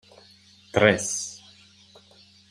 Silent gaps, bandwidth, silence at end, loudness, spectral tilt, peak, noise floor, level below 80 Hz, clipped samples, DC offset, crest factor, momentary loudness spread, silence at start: none; 15.5 kHz; 1.15 s; -23 LUFS; -3.5 dB/octave; -2 dBFS; -55 dBFS; -62 dBFS; under 0.1%; under 0.1%; 26 dB; 17 LU; 0.75 s